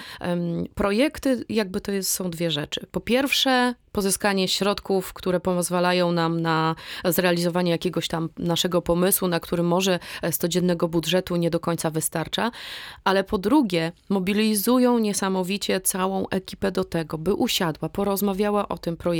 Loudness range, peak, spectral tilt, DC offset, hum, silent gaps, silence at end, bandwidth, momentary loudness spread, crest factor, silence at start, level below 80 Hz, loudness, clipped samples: 2 LU; -6 dBFS; -4.5 dB/octave; under 0.1%; none; none; 0 s; over 20 kHz; 7 LU; 16 dB; 0 s; -50 dBFS; -23 LUFS; under 0.1%